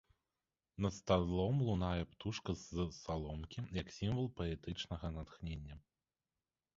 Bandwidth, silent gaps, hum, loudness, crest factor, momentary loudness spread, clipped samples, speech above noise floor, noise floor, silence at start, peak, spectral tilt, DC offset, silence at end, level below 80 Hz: 7.6 kHz; none; none; -41 LUFS; 24 dB; 12 LU; under 0.1%; over 50 dB; under -90 dBFS; 0.8 s; -18 dBFS; -6.5 dB/octave; under 0.1%; 1 s; -52 dBFS